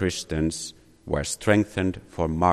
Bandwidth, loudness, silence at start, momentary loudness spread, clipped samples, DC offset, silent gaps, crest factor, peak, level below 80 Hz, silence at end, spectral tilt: 13 kHz; -26 LUFS; 0 s; 12 LU; under 0.1%; under 0.1%; none; 18 dB; -6 dBFS; -40 dBFS; 0 s; -5 dB/octave